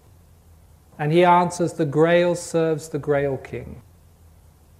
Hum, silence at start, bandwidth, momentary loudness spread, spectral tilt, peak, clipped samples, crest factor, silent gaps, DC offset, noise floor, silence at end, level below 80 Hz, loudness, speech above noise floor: none; 1 s; 15 kHz; 15 LU; -6 dB/octave; -4 dBFS; under 0.1%; 18 dB; none; under 0.1%; -51 dBFS; 1 s; -52 dBFS; -20 LUFS; 31 dB